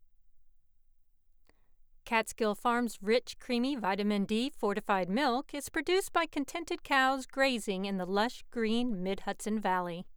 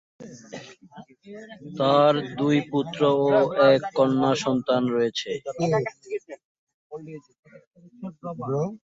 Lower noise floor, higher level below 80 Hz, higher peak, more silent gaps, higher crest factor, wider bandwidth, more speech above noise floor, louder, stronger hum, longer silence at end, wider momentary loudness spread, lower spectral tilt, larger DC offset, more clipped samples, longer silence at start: first, -63 dBFS vs -48 dBFS; first, -56 dBFS vs -66 dBFS; second, -14 dBFS vs -6 dBFS; second, none vs 6.44-6.67 s, 6.74-6.90 s, 7.39-7.43 s, 7.67-7.71 s; about the same, 18 dB vs 20 dB; first, over 20 kHz vs 7.8 kHz; first, 31 dB vs 25 dB; second, -32 LUFS vs -23 LUFS; neither; about the same, 0 s vs 0.1 s; second, 6 LU vs 23 LU; second, -4.5 dB/octave vs -6 dB/octave; neither; neither; about the same, 0.25 s vs 0.2 s